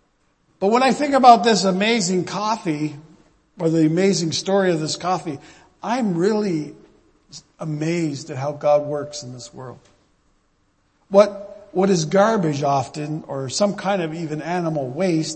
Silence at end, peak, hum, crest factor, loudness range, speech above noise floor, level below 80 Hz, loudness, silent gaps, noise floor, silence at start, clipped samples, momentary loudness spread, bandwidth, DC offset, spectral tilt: 0 s; 0 dBFS; none; 20 dB; 7 LU; 44 dB; -62 dBFS; -20 LUFS; none; -64 dBFS; 0.6 s; under 0.1%; 15 LU; 8.8 kHz; under 0.1%; -5 dB/octave